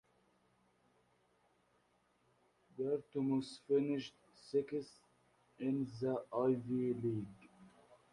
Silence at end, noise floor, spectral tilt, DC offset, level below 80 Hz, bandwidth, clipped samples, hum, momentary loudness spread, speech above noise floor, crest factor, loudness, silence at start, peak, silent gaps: 0.45 s; -76 dBFS; -8 dB/octave; under 0.1%; -78 dBFS; 11 kHz; under 0.1%; none; 9 LU; 38 dB; 18 dB; -39 LUFS; 2.75 s; -24 dBFS; none